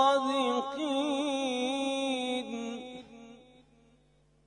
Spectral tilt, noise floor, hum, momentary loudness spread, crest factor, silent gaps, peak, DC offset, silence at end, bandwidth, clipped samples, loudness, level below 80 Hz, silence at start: -3 dB/octave; -66 dBFS; none; 17 LU; 20 dB; none; -14 dBFS; under 0.1%; 1.05 s; 10.5 kHz; under 0.1%; -31 LUFS; -70 dBFS; 0 s